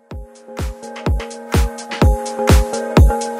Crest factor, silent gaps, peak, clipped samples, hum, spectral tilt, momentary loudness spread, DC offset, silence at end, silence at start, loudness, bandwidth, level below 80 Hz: 16 dB; none; 0 dBFS; under 0.1%; none; -6 dB/octave; 15 LU; under 0.1%; 0 s; 0.1 s; -18 LUFS; 16 kHz; -20 dBFS